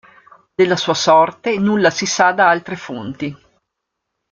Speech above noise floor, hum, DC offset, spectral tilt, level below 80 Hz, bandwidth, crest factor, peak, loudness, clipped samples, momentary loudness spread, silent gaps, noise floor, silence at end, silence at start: 62 dB; none; under 0.1%; -4 dB/octave; -60 dBFS; 7.6 kHz; 16 dB; -2 dBFS; -15 LUFS; under 0.1%; 15 LU; none; -77 dBFS; 0.95 s; 0.6 s